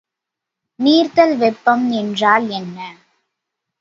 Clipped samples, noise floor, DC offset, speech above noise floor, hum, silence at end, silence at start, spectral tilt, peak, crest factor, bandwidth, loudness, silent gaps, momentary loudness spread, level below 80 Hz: under 0.1%; -83 dBFS; under 0.1%; 68 dB; none; 0.9 s; 0.8 s; -5.5 dB/octave; 0 dBFS; 18 dB; 7.6 kHz; -15 LUFS; none; 16 LU; -68 dBFS